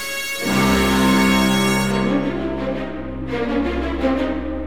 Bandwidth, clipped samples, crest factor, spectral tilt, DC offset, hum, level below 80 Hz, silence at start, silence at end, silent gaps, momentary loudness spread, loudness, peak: 18 kHz; under 0.1%; 16 dB; -5 dB/octave; 1%; none; -34 dBFS; 0 s; 0 s; none; 10 LU; -19 LUFS; -4 dBFS